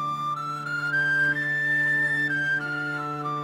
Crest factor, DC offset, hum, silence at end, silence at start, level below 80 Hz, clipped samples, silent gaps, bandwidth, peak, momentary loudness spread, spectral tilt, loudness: 10 dB; under 0.1%; none; 0 s; 0 s; -68 dBFS; under 0.1%; none; 16.5 kHz; -16 dBFS; 8 LU; -5 dB/octave; -24 LUFS